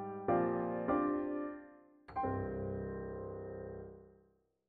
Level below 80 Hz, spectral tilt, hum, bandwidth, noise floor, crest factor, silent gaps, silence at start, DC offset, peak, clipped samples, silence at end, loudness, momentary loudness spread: -60 dBFS; -9 dB/octave; none; 4.6 kHz; -72 dBFS; 18 dB; none; 0 s; under 0.1%; -20 dBFS; under 0.1%; 0.6 s; -38 LUFS; 17 LU